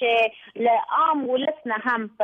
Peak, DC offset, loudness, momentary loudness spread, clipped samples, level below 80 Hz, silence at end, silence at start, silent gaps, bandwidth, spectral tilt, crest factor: -10 dBFS; under 0.1%; -23 LUFS; 5 LU; under 0.1%; -74 dBFS; 0 s; 0 s; none; 6.2 kHz; -5.5 dB/octave; 12 dB